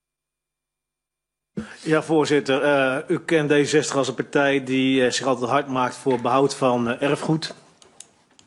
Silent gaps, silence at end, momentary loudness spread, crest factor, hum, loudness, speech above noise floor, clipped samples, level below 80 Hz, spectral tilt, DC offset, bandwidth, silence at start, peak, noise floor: none; 0.95 s; 6 LU; 18 dB; none; -21 LUFS; 65 dB; under 0.1%; -64 dBFS; -5 dB/octave; under 0.1%; 11.5 kHz; 1.55 s; -4 dBFS; -85 dBFS